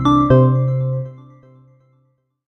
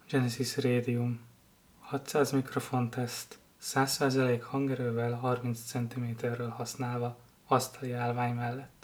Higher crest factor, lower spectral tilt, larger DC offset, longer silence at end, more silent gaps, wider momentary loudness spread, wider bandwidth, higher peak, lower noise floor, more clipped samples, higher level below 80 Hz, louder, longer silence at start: about the same, 16 dB vs 20 dB; first, -9.5 dB/octave vs -5.5 dB/octave; neither; first, 1.35 s vs 0.15 s; neither; first, 14 LU vs 9 LU; second, 6.2 kHz vs over 20 kHz; first, -2 dBFS vs -12 dBFS; about the same, -63 dBFS vs -62 dBFS; neither; first, -42 dBFS vs -70 dBFS; first, -15 LUFS vs -32 LUFS; about the same, 0 s vs 0.1 s